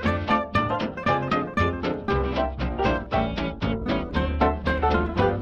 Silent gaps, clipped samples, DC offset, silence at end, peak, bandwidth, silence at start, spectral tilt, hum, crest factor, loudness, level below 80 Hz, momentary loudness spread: none; under 0.1%; under 0.1%; 0 s; -6 dBFS; 7.4 kHz; 0 s; -7.5 dB/octave; none; 18 dB; -25 LUFS; -34 dBFS; 5 LU